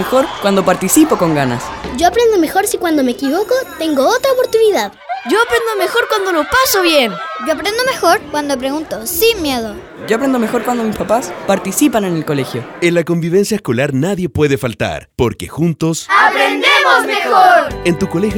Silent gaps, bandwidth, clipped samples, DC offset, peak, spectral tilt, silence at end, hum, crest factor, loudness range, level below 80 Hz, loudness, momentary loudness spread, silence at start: none; over 20 kHz; under 0.1%; under 0.1%; 0 dBFS; -4 dB/octave; 0 s; none; 14 dB; 4 LU; -42 dBFS; -13 LUFS; 8 LU; 0 s